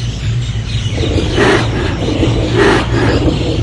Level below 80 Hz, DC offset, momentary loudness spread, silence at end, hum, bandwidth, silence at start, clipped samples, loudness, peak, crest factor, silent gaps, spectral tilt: -22 dBFS; under 0.1%; 7 LU; 0 s; none; 11 kHz; 0 s; under 0.1%; -13 LUFS; 0 dBFS; 12 dB; none; -6 dB/octave